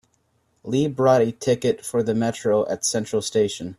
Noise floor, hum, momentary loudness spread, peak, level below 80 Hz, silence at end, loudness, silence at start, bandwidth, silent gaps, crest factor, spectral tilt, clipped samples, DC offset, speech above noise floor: -67 dBFS; none; 6 LU; -4 dBFS; -60 dBFS; 0.05 s; -22 LUFS; 0.65 s; 14 kHz; none; 18 dB; -5 dB/octave; under 0.1%; under 0.1%; 45 dB